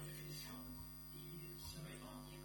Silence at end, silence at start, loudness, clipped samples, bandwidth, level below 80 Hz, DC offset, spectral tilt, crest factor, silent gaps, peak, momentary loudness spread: 0 s; 0 s; -51 LUFS; under 0.1%; 17.5 kHz; -62 dBFS; under 0.1%; -4 dB/octave; 14 dB; none; -38 dBFS; 3 LU